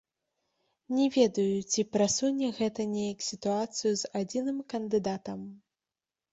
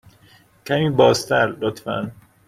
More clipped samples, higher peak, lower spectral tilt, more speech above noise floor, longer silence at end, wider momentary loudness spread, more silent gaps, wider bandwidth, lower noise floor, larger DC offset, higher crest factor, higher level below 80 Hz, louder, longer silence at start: neither; second, -12 dBFS vs -2 dBFS; about the same, -4.5 dB/octave vs -5 dB/octave; first, over 60 dB vs 34 dB; first, 0.75 s vs 0.35 s; second, 9 LU vs 14 LU; neither; second, 8.2 kHz vs 15 kHz; first, under -90 dBFS vs -53 dBFS; neither; about the same, 20 dB vs 18 dB; second, -70 dBFS vs -54 dBFS; second, -30 LUFS vs -19 LUFS; first, 0.9 s vs 0.65 s